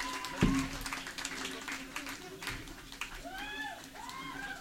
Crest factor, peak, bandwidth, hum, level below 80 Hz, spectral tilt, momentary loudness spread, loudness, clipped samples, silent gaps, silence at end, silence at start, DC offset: 24 dB; -14 dBFS; 16.5 kHz; none; -50 dBFS; -4 dB/octave; 12 LU; -38 LUFS; under 0.1%; none; 0 s; 0 s; under 0.1%